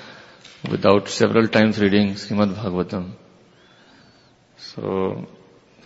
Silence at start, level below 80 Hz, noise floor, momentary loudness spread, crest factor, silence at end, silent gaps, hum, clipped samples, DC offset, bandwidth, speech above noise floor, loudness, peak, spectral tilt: 0 s; -58 dBFS; -54 dBFS; 19 LU; 22 dB; 0.55 s; none; none; under 0.1%; under 0.1%; 8 kHz; 34 dB; -20 LUFS; 0 dBFS; -6 dB/octave